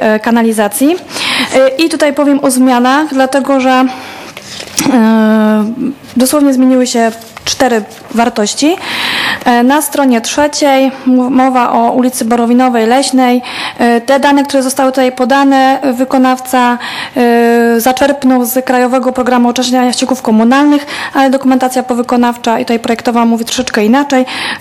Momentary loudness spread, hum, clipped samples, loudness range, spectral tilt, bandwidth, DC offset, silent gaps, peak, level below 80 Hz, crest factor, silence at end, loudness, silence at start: 5 LU; none; 0.3%; 2 LU; -3.5 dB/octave; 15.5 kHz; under 0.1%; none; 0 dBFS; -48 dBFS; 10 dB; 0 s; -10 LUFS; 0 s